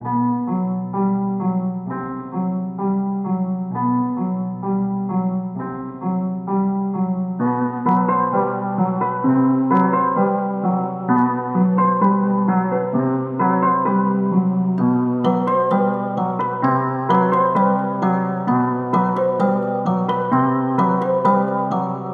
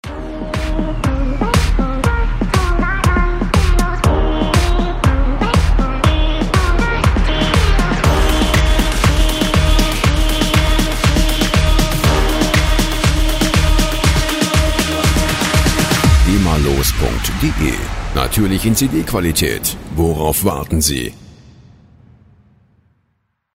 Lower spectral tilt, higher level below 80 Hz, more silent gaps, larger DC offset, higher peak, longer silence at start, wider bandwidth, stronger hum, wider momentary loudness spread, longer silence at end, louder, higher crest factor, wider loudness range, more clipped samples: first, -10.5 dB/octave vs -4.5 dB/octave; second, -62 dBFS vs -18 dBFS; neither; neither; second, -4 dBFS vs 0 dBFS; about the same, 0 s vs 0.05 s; second, 4.4 kHz vs 16.5 kHz; neither; about the same, 7 LU vs 5 LU; second, 0 s vs 2.3 s; second, -19 LUFS vs -15 LUFS; about the same, 14 dB vs 14 dB; about the same, 5 LU vs 3 LU; neither